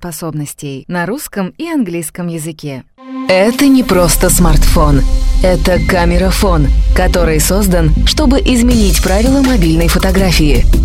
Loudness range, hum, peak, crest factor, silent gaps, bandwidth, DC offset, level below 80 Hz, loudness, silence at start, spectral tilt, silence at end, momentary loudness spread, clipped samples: 4 LU; none; 0 dBFS; 10 dB; none; 16 kHz; under 0.1%; -14 dBFS; -11 LUFS; 0 s; -5 dB/octave; 0 s; 12 LU; under 0.1%